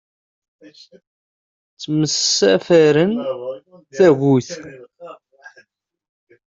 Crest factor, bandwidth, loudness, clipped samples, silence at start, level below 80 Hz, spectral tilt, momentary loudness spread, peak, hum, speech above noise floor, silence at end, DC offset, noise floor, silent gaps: 16 dB; 7.8 kHz; -16 LUFS; under 0.1%; 1.8 s; -62 dBFS; -4.5 dB/octave; 21 LU; -2 dBFS; none; 38 dB; 1.45 s; under 0.1%; -55 dBFS; none